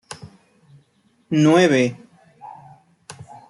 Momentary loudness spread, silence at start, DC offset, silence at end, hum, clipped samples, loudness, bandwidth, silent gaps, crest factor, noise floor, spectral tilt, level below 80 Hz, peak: 27 LU; 0.1 s; under 0.1%; 0.4 s; none; under 0.1%; -17 LUFS; 11.5 kHz; none; 20 dB; -61 dBFS; -6 dB/octave; -66 dBFS; -4 dBFS